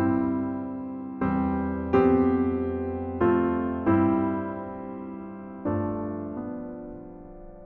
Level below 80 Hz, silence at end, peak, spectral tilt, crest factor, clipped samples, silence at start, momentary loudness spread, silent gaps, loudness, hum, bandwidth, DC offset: -50 dBFS; 0 s; -10 dBFS; -8.5 dB/octave; 18 dB; under 0.1%; 0 s; 16 LU; none; -27 LUFS; none; 4.3 kHz; under 0.1%